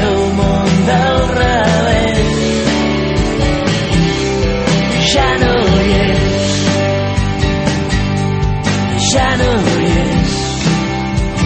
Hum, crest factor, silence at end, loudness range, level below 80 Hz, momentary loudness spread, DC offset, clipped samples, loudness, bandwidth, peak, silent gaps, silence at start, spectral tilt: none; 12 dB; 0 s; 1 LU; -22 dBFS; 4 LU; under 0.1%; under 0.1%; -13 LUFS; 8.8 kHz; 0 dBFS; none; 0 s; -5 dB/octave